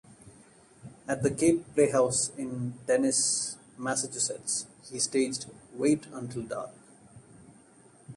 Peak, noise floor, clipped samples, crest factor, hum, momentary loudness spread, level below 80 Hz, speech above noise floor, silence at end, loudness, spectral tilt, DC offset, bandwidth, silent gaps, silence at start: -10 dBFS; -57 dBFS; under 0.1%; 20 dB; none; 13 LU; -64 dBFS; 29 dB; 0 s; -29 LUFS; -3.5 dB/octave; under 0.1%; 11.5 kHz; none; 0.1 s